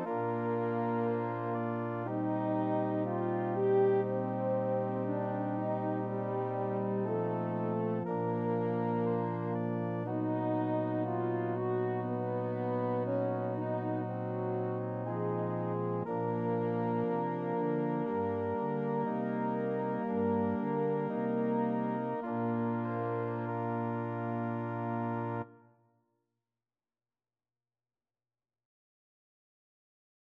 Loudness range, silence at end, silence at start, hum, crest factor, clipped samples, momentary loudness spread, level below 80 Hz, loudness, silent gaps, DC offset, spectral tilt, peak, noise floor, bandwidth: 4 LU; 4.7 s; 0 s; none; 16 dB; under 0.1%; 4 LU; -80 dBFS; -34 LUFS; none; under 0.1%; -11 dB/octave; -18 dBFS; under -90 dBFS; 4.3 kHz